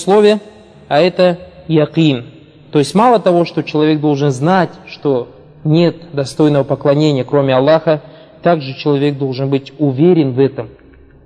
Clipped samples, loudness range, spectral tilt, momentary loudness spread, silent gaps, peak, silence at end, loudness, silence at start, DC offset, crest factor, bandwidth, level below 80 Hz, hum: under 0.1%; 1 LU; -7 dB/octave; 9 LU; none; 0 dBFS; 0.55 s; -14 LUFS; 0 s; under 0.1%; 14 dB; 11 kHz; -52 dBFS; none